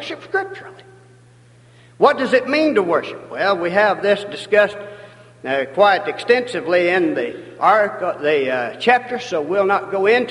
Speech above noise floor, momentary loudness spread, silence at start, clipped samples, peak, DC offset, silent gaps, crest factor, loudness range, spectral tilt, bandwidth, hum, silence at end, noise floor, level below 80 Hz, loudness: 30 dB; 9 LU; 0 s; under 0.1%; 0 dBFS; under 0.1%; none; 18 dB; 2 LU; -5 dB/octave; 11.5 kHz; none; 0 s; -48 dBFS; -64 dBFS; -18 LUFS